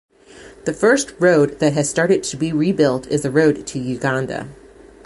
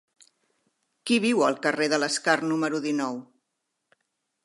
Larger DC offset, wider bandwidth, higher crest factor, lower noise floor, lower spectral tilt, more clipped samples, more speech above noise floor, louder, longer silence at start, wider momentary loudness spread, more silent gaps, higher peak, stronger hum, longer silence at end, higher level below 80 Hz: neither; about the same, 11.5 kHz vs 11.5 kHz; about the same, 16 dB vs 20 dB; second, -43 dBFS vs -80 dBFS; first, -5 dB/octave vs -3.5 dB/octave; neither; second, 25 dB vs 56 dB; first, -18 LUFS vs -25 LUFS; second, 0.35 s vs 1.05 s; first, 11 LU vs 8 LU; neither; first, -2 dBFS vs -6 dBFS; neither; second, 0.5 s vs 1.2 s; first, -52 dBFS vs -82 dBFS